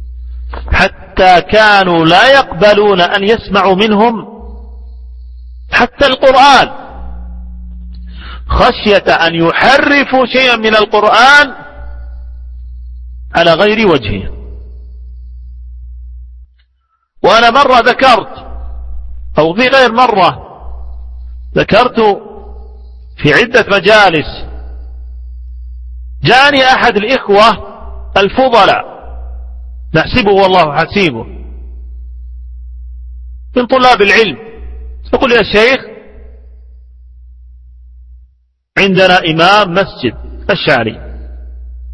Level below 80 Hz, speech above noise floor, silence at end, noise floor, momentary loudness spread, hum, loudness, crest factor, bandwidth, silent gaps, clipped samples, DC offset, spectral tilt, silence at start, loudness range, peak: -28 dBFS; 51 dB; 0 s; -59 dBFS; 24 LU; none; -8 LUFS; 10 dB; 11 kHz; none; 0.9%; under 0.1%; -5 dB/octave; 0 s; 6 LU; 0 dBFS